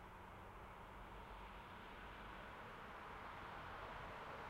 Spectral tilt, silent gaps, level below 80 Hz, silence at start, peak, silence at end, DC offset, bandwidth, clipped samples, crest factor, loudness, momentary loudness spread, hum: -5 dB/octave; none; -64 dBFS; 0 s; -40 dBFS; 0 s; under 0.1%; 16 kHz; under 0.1%; 14 dB; -55 LUFS; 5 LU; none